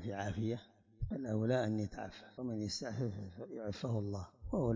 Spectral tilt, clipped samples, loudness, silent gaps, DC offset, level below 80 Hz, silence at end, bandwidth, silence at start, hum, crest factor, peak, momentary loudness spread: -6.5 dB/octave; under 0.1%; -40 LUFS; none; under 0.1%; -56 dBFS; 0 s; 7.6 kHz; 0 s; none; 16 dB; -22 dBFS; 12 LU